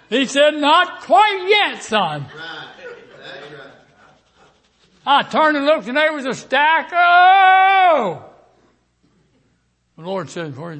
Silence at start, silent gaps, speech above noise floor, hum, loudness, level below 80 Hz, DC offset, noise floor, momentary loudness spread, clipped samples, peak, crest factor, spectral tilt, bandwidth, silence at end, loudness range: 0.1 s; none; 48 dB; none; -14 LUFS; -68 dBFS; under 0.1%; -64 dBFS; 23 LU; under 0.1%; -2 dBFS; 14 dB; -3.5 dB/octave; 8.8 kHz; 0 s; 11 LU